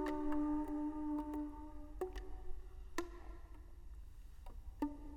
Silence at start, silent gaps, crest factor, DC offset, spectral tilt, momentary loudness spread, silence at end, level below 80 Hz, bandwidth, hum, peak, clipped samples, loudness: 0 s; none; 20 dB; under 0.1%; -6.5 dB/octave; 19 LU; 0 s; -52 dBFS; 16.5 kHz; none; -24 dBFS; under 0.1%; -44 LUFS